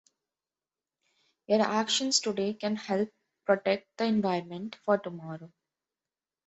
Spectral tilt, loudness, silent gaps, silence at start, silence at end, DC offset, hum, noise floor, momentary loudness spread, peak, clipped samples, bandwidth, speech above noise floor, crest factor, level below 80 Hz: -3.5 dB/octave; -29 LUFS; none; 1.5 s; 1 s; under 0.1%; none; under -90 dBFS; 14 LU; -10 dBFS; under 0.1%; 8.2 kHz; over 61 dB; 20 dB; -74 dBFS